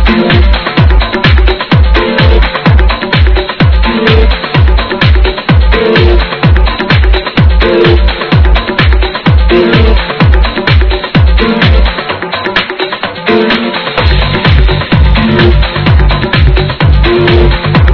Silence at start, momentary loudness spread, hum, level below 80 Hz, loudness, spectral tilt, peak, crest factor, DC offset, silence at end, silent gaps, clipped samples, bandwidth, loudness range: 0 s; 3 LU; none; -10 dBFS; -8 LUFS; -8 dB/octave; 0 dBFS; 6 dB; under 0.1%; 0 s; none; 6%; 5.4 kHz; 2 LU